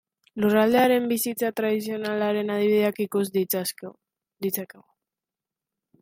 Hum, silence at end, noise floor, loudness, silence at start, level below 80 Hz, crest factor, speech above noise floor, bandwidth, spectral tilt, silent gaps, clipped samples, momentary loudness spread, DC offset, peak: none; 1.35 s; -89 dBFS; -24 LUFS; 0.35 s; -70 dBFS; 18 dB; 66 dB; 16.5 kHz; -4.5 dB/octave; none; under 0.1%; 13 LU; under 0.1%; -8 dBFS